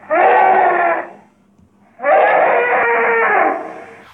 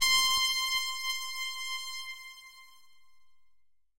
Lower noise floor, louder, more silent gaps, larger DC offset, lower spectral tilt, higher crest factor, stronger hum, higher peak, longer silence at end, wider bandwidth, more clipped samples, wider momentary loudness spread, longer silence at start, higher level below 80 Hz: second, -52 dBFS vs -71 dBFS; first, -13 LUFS vs -29 LUFS; neither; neither; first, -6 dB/octave vs 3.5 dB/octave; second, 14 dB vs 22 dB; neither; first, 0 dBFS vs -12 dBFS; about the same, 0.2 s vs 0.3 s; second, 4.1 kHz vs 16 kHz; neither; second, 11 LU vs 20 LU; about the same, 0.1 s vs 0 s; second, -70 dBFS vs -62 dBFS